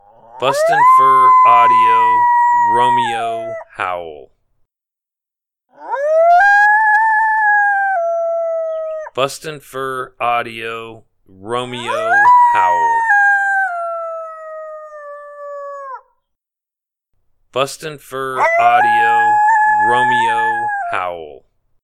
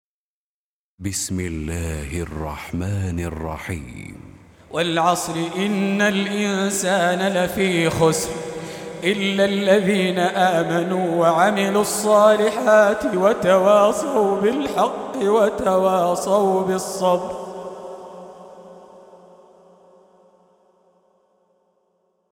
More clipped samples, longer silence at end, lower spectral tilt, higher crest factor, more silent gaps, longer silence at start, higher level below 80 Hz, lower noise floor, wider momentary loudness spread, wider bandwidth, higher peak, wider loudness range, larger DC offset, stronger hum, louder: neither; second, 0.5 s vs 3.35 s; second, -3 dB/octave vs -4.5 dB/octave; about the same, 14 dB vs 18 dB; neither; second, 0.35 s vs 1 s; second, -58 dBFS vs -44 dBFS; second, -86 dBFS vs under -90 dBFS; first, 20 LU vs 15 LU; second, 14.5 kHz vs 19.5 kHz; about the same, 0 dBFS vs -2 dBFS; first, 14 LU vs 11 LU; neither; neither; first, -13 LUFS vs -19 LUFS